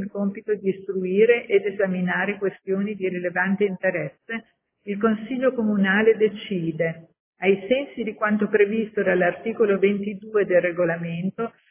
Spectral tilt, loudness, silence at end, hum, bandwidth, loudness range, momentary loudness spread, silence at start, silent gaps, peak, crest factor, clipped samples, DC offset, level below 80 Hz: -10.5 dB/octave; -23 LUFS; 0.2 s; none; 3.6 kHz; 3 LU; 9 LU; 0 s; 7.20-7.33 s; -6 dBFS; 18 dB; under 0.1%; under 0.1%; -64 dBFS